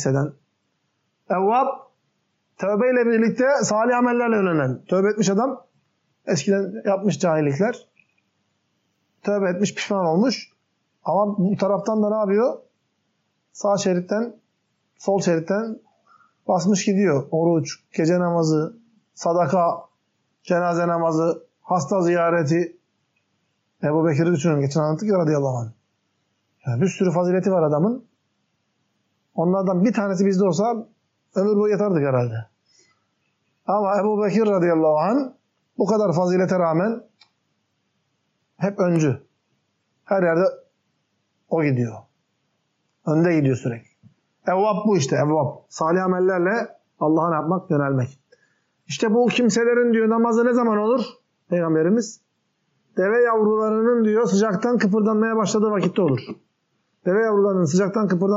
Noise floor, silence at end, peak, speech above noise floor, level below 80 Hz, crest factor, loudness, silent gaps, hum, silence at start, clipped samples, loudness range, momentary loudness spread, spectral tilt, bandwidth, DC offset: -72 dBFS; 0 s; -8 dBFS; 52 dB; -74 dBFS; 12 dB; -21 LUFS; none; none; 0 s; under 0.1%; 4 LU; 10 LU; -6.5 dB/octave; 8 kHz; under 0.1%